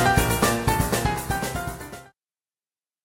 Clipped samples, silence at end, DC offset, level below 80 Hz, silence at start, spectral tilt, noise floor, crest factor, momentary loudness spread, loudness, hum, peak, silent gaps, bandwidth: under 0.1%; 1 s; under 0.1%; -36 dBFS; 0 s; -4.5 dB/octave; under -90 dBFS; 20 dB; 18 LU; -23 LUFS; none; -6 dBFS; none; 16.5 kHz